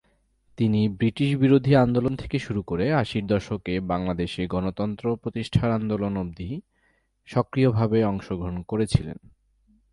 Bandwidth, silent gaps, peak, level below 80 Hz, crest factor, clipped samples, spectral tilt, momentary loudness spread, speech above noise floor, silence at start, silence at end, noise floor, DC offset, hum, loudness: 11.5 kHz; none; -6 dBFS; -44 dBFS; 20 dB; under 0.1%; -8 dB/octave; 11 LU; 44 dB; 0.6 s; 0.8 s; -67 dBFS; under 0.1%; none; -25 LUFS